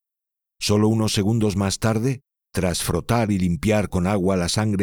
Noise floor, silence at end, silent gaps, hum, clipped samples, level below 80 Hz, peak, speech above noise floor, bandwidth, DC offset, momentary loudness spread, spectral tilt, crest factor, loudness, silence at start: -86 dBFS; 0 s; none; none; under 0.1%; -42 dBFS; -6 dBFS; 65 dB; 19 kHz; under 0.1%; 6 LU; -5.5 dB/octave; 16 dB; -21 LUFS; 0.6 s